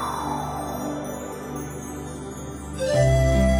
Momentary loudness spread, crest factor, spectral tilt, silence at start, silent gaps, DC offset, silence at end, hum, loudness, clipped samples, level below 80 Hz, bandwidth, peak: 15 LU; 16 dB; -6 dB/octave; 0 s; none; under 0.1%; 0 s; none; -26 LUFS; under 0.1%; -32 dBFS; 16.5 kHz; -8 dBFS